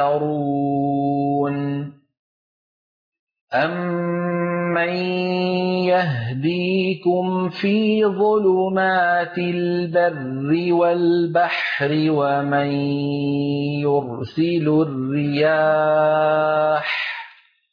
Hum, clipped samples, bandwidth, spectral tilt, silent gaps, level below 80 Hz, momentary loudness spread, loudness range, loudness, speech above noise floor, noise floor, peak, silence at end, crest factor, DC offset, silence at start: none; under 0.1%; 5.2 kHz; -9 dB/octave; 2.19-3.12 s, 3.19-3.27 s, 3.41-3.47 s; -64 dBFS; 6 LU; 6 LU; -20 LUFS; 27 dB; -46 dBFS; -8 dBFS; 0.45 s; 12 dB; under 0.1%; 0 s